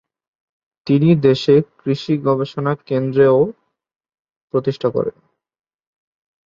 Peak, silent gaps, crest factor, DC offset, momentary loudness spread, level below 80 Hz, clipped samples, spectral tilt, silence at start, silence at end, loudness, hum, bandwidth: 0 dBFS; 4.19-4.25 s, 4.36-4.48 s; 18 dB; under 0.1%; 10 LU; -58 dBFS; under 0.1%; -8.5 dB/octave; 0.85 s; 1.35 s; -17 LUFS; none; 7.4 kHz